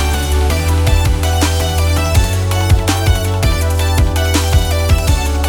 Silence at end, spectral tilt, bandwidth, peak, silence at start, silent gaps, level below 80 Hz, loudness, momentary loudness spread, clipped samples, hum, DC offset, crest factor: 0 s; -4.5 dB/octave; 20 kHz; -2 dBFS; 0 s; none; -16 dBFS; -14 LUFS; 2 LU; under 0.1%; none; under 0.1%; 12 dB